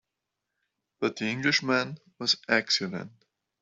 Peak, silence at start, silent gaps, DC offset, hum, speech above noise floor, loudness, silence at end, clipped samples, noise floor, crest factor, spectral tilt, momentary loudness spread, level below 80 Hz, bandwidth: -8 dBFS; 1 s; none; under 0.1%; none; 57 dB; -27 LUFS; 0.55 s; under 0.1%; -85 dBFS; 24 dB; -3.5 dB/octave; 12 LU; -72 dBFS; 8.2 kHz